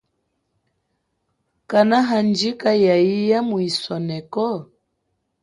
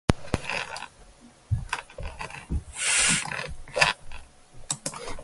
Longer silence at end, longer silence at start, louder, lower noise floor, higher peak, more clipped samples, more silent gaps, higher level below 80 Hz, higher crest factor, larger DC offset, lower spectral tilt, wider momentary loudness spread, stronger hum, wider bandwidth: first, 0.8 s vs 0 s; first, 1.7 s vs 0.1 s; first, -19 LUFS vs -27 LUFS; first, -73 dBFS vs -52 dBFS; about the same, -2 dBFS vs 0 dBFS; neither; neither; second, -64 dBFS vs -40 dBFS; second, 18 dB vs 30 dB; neither; first, -6 dB/octave vs -2.5 dB/octave; second, 10 LU vs 18 LU; neither; about the same, 11.5 kHz vs 12 kHz